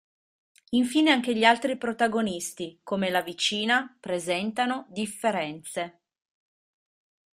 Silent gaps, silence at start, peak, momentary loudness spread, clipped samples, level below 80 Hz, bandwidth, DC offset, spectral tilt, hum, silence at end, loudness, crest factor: none; 0.7 s; -4 dBFS; 12 LU; under 0.1%; -70 dBFS; 15.5 kHz; under 0.1%; -3.5 dB/octave; none; 1.45 s; -26 LUFS; 24 dB